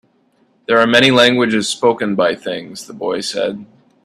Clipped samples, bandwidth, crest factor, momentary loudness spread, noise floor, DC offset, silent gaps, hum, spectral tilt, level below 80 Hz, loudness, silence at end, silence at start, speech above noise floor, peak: under 0.1%; 14 kHz; 16 dB; 16 LU; -57 dBFS; under 0.1%; none; none; -4 dB/octave; -58 dBFS; -14 LUFS; 0.4 s; 0.7 s; 43 dB; 0 dBFS